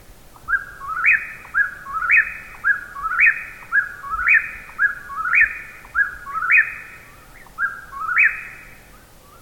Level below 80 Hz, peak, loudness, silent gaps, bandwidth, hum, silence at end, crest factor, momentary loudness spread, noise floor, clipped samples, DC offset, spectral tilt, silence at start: -48 dBFS; -4 dBFS; -18 LUFS; none; 18 kHz; none; 0.7 s; 18 dB; 14 LU; -46 dBFS; under 0.1%; under 0.1%; -2.5 dB/octave; 0.1 s